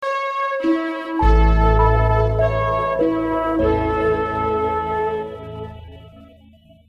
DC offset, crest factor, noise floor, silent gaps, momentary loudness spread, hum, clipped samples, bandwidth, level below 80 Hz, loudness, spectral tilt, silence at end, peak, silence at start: under 0.1%; 16 dB; -49 dBFS; none; 13 LU; none; under 0.1%; 6.4 kHz; -24 dBFS; -19 LUFS; -8.5 dB/octave; 0.65 s; -4 dBFS; 0 s